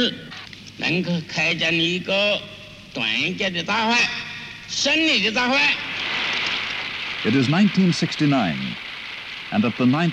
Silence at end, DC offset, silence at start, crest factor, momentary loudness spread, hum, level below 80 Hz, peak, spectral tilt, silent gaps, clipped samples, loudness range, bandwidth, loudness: 0 s; under 0.1%; 0 s; 14 dB; 14 LU; none; -56 dBFS; -8 dBFS; -4.5 dB/octave; none; under 0.1%; 2 LU; 11.5 kHz; -20 LUFS